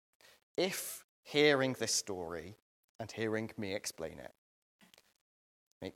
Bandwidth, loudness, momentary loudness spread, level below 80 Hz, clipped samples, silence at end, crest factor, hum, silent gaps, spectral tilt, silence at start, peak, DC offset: 16.5 kHz; -35 LUFS; 20 LU; -76 dBFS; under 0.1%; 0.05 s; 24 dB; none; 1.04-1.23 s, 2.62-2.99 s, 4.38-4.79 s, 5.21-5.81 s; -3 dB/octave; 0.6 s; -14 dBFS; under 0.1%